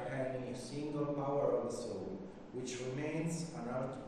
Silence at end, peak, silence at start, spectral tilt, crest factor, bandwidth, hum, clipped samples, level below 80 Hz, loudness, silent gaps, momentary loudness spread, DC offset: 0 s; -22 dBFS; 0 s; -6 dB/octave; 18 dB; 13 kHz; none; under 0.1%; -64 dBFS; -40 LUFS; none; 9 LU; under 0.1%